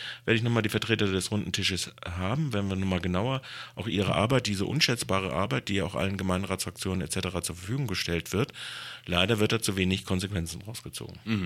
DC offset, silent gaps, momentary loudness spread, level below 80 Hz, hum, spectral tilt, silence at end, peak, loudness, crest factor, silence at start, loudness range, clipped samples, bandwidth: under 0.1%; none; 10 LU; -52 dBFS; none; -4.5 dB/octave; 0 s; -8 dBFS; -29 LUFS; 22 dB; 0 s; 2 LU; under 0.1%; 16 kHz